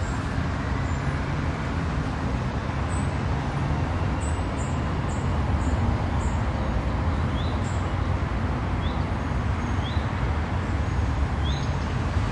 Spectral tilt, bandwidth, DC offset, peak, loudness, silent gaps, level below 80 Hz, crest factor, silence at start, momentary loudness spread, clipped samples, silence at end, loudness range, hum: -6.5 dB/octave; 10.5 kHz; under 0.1%; -12 dBFS; -27 LUFS; none; -30 dBFS; 12 dB; 0 s; 2 LU; under 0.1%; 0 s; 1 LU; none